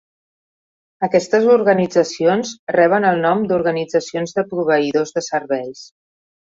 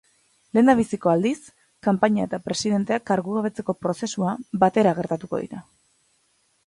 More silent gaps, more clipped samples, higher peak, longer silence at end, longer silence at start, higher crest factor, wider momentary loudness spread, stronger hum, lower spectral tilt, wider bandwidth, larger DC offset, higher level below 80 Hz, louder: first, 2.59-2.67 s vs none; neither; about the same, -2 dBFS vs -4 dBFS; second, 0.65 s vs 1.05 s; first, 1 s vs 0.55 s; about the same, 16 dB vs 20 dB; about the same, 8 LU vs 10 LU; neither; about the same, -5.5 dB/octave vs -6 dB/octave; second, 7.8 kHz vs 11.5 kHz; neither; about the same, -62 dBFS vs -60 dBFS; first, -17 LUFS vs -23 LUFS